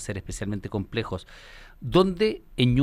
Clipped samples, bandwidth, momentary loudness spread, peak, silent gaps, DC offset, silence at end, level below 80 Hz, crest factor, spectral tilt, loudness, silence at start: under 0.1%; 14.5 kHz; 16 LU; -6 dBFS; none; under 0.1%; 0 s; -42 dBFS; 20 dB; -6.5 dB/octave; -26 LUFS; 0 s